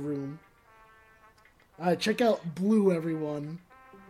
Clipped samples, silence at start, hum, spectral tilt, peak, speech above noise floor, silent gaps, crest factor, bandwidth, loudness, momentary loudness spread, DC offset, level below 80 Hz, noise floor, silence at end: under 0.1%; 0 s; none; -6.5 dB/octave; -14 dBFS; 33 dB; none; 18 dB; 14.5 kHz; -28 LUFS; 17 LU; under 0.1%; -70 dBFS; -61 dBFS; 0.1 s